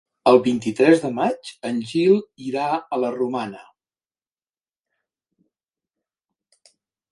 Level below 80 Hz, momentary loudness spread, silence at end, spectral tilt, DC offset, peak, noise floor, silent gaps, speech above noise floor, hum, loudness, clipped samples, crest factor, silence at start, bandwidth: -68 dBFS; 12 LU; 3.5 s; -6 dB/octave; under 0.1%; 0 dBFS; under -90 dBFS; none; over 70 dB; none; -20 LUFS; under 0.1%; 22 dB; 0.25 s; 11.5 kHz